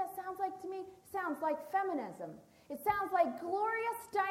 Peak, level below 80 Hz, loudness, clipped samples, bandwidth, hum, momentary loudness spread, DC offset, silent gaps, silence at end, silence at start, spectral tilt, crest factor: -18 dBFS; -72 dBFS; -37 LUFS; under 0.1%; 16.5 kHz; none; 13 LU; under 0.1%; none; 0 s; 0 s; -5 dB/octave; 18 dB